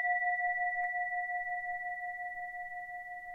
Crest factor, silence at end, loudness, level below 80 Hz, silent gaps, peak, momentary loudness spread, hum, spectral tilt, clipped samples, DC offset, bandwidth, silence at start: 14 dB; 0 s; -35 LUFS; -70 dBFS; none; -22 dBFS; 11 LU; none; -3.5 dB/octave; under 0.1%; under 0.1%; 3.8 kHz; 0 s